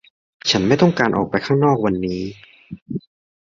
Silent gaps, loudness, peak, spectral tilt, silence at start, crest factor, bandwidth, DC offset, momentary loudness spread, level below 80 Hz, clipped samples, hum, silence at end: 2.82-2.86 s; -18 LUFS; -2 dBFS; -5.5 dB/octave; 0.45 s; 18 dB; 7.4 kHz; under 0.1%; 16 LU; -48 dBFS; under 0.1%; none; 0.4 s